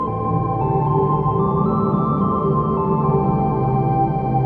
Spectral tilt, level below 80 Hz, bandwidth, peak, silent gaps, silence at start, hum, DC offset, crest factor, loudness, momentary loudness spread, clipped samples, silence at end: -12.5 dB/octave; -36 dBFS; 4.2 kHz; -6 dBFS; none; 0 s; none; under 0.1%; 12 dB; -19 LUFS; 2 LU; under 0.1%; 0 s